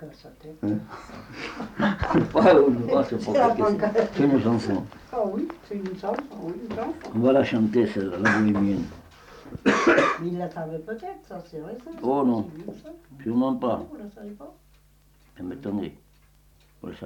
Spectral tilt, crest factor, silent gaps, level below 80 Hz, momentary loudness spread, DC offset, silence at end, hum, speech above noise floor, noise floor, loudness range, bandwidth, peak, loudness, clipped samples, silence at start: -7 dB/octave; 18 dB; none; -52 dBFS; 20 LU; under 0.1%; 0 s; none; 33 dB; -58 dBFS; 10 LU; 10.5 kHz; -6 dBFS; -24 LUFS; under 0.1%; 0 s